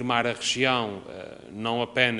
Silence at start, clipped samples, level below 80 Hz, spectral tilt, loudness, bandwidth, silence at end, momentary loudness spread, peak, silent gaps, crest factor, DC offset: 0 s; under 0.1%; -62 dBFS; -3.5 dB/octave; -25 LUFS; 11.5 kHz; 0 s; 18 LU; -4 dBFS; none; 22 dB; under 0.1%